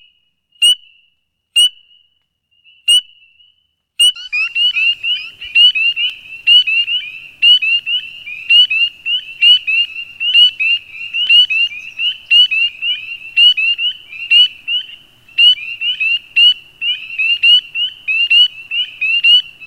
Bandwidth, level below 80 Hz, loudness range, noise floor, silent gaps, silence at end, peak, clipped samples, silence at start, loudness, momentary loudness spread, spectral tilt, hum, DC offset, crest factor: 17.5 kHz; -62 dBFS; 4 LU; -63 dBFS; none; 0 s; 0 dBFS; under 0.1%; 0.6 s; -10 LUFS; 11 LU; 4.5 dB/octave; none; 0.1%; 14 dB